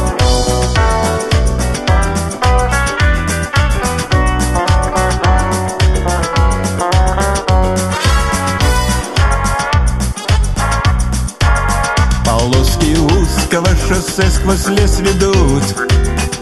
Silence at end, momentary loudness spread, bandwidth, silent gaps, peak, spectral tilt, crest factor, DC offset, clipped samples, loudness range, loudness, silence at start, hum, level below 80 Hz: 0 s; 3 LU; 12.5 kHz; none; 0 dBFS; -5 dB/octave; 12 dB; under 0.1%; under 0.1%; 2 LU; -13 LUFS; 0 s; none; -16 dBFS